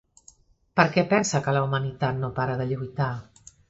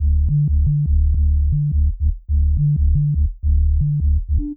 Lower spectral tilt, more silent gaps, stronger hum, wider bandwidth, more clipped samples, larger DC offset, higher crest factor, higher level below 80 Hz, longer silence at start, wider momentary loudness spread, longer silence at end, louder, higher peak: second, -5.5 dB/octave vs -17.5 dB/octave; neither; neither; first, 8.2 kHz vs 0.5 kHz; neither; neither; first, 24 dB vs 8 dB; second, -56 dBFS vs -18 dBFS; first, 0.75 s vs 0 s; first, 8 LU vs 3 LU; first, 0.45 s vs 0 s; second, -25 LUFS vs -19 LUFS; first, -2 dBFS vs -8 dBFS